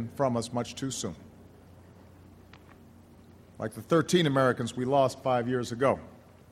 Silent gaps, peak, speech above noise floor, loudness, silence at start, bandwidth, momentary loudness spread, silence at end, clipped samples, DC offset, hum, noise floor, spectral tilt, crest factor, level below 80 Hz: none; -10 dBFS; 26 dB; -28 LUFS; 0 s; 15.5 kHz; 14 LU; 0.35 s; under 0.1%; under 0.1%; none; -54 dBFS; -5.5 dB/octave; 20 dB; -64 dBFS